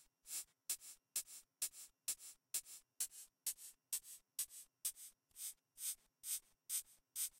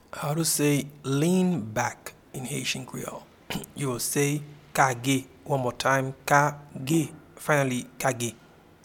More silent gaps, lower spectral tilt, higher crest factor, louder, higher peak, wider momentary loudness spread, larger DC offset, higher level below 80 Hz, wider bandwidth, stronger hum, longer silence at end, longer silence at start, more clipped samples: neither; second, 3.5 dB/octave vs -4.5 dB/octave; about the same, 22 dB vs 24 dB; second, -46 LUFS vs -27 LUFS; second, -28 dBFS vs -4 dBFS; second, 6 LU vs 13 LU; neither; second, -86 dBFS vs -60 dBFS; second, 16 kHz vs 18.5 kHz; neither; second, 0 s vs 0.5 s; second, 0 s vs 0.15 s; neither